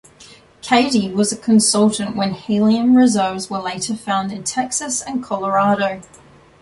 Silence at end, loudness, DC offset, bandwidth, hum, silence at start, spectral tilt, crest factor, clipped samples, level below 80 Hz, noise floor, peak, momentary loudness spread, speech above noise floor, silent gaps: 0.6 s; -17 LUFS; under 0.1%; 11.5 kHz; none; 0.2 s; -4 dB/octave; 16 dB; under 0.1%; -56 dBFS; -45 dBFS; -2 dBFS; 10 LU; 28 dB; none